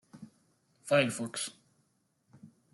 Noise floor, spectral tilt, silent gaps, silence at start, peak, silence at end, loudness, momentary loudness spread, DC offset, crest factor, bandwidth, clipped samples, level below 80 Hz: -75 dBFS; -4 dB/octave; none; 0.15 s; -12 dBFS; 0.25 s; -31 LUFS; 25 LU; under 0.1%; 24 dB; 12.5 kHz; under 0.1%; -80 dBFS